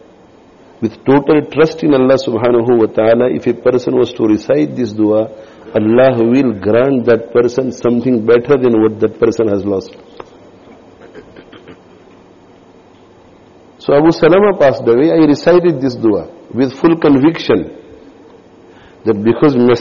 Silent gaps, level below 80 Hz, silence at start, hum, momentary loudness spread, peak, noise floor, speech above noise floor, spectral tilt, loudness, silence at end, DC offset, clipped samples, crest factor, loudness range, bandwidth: none; -48 dBFS; 0.8 s; none; 8 LU; -2 dBFS; -42 dBFS; 31 dB; -6 dB/octave; -12 LUFS; 0 s; under 0.1%; under 0.1%; 12 dB; 6 LU; 7.2 kHz